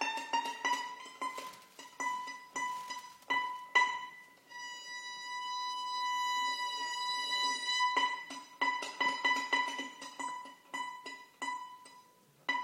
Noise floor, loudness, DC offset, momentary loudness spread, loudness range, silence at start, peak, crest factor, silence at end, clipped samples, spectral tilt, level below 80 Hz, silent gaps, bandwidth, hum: -63 dBFS; -35 LUFS; under 0.1%; 16 LU; 5 LU; 0 s; -16 dBFS; 22 dB; 0 s; under 0.1%; 1 dB/octave; -90 dBFS; none; 16.5 kHz; none